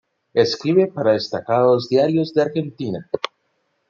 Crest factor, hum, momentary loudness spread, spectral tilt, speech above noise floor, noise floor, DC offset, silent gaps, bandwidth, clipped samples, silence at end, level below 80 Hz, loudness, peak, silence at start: 18 dB; none; 10 LU; -6.5 dB/octave; 51 dB; -69 dBFS; under 0.1%; none; 7.4 kHz; under 0.1%; 0.65 s; -66 dBFS; -19 LUFS; -2 dBFS; 0.35 s